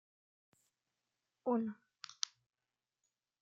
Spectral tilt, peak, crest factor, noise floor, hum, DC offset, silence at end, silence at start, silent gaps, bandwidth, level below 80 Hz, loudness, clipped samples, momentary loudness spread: -3.5 dB/octave; -12 dBFS; 34 dB; under -90 dBFS; none; under 0.1%; 1.65 s; 1.45 s; none; 8 kHz; under -90 dBFS; -41 LUFS; under 0.1%; 15 LU